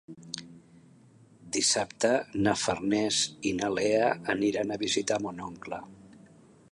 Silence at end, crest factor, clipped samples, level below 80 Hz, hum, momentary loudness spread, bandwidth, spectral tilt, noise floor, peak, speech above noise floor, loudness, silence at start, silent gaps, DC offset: 0.65 s; 20 dB; under 0.1%; -62 dBFS; none; 15 LU; 11.5 kHz; -3 dB/octave; -57 dBFS; -10 dBFS; 29 dB; -28 LUFS; 0.1 s; none; under 0.1%